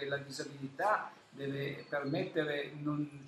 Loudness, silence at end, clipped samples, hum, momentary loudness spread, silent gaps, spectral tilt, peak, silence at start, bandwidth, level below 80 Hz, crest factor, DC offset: -37 LUFS; 0 s; under 0.1%; none; 10 LU; none; -5.5 dB/octave; -20 dBFS; 0 s; 13.5 kHz; -78 dBFS; 18 dB; under 0.1%